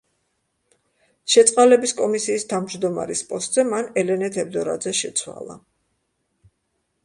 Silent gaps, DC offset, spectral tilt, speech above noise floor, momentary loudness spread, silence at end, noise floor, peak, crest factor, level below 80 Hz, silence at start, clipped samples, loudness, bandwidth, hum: none; under 0.1%; -3 dB/octave; 53 dB; 12 LU; 1.45 s; -73 dBFS; 0 dBFS; 22 dB; -66 dBFS; 1.25 s; under 0.1%; -20 LUFS; 11.5 kHz; none